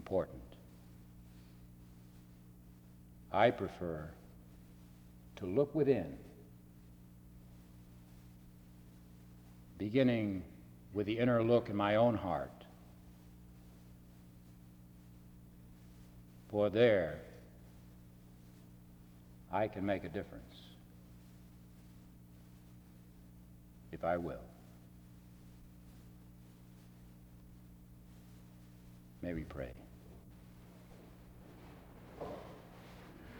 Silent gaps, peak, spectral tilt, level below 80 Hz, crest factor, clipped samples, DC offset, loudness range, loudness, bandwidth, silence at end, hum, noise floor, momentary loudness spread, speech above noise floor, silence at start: none; -16 dBFS; -7.5 dB/octave; -62 dBFS; 24 dB; under 0.1%; under 0.1%; 23 LU; -36 LUFS; over 20 kHz; 0 s; 60 Hz at -65 dBFS; -58 dBFS; 27 LU; 24 dB; 0 s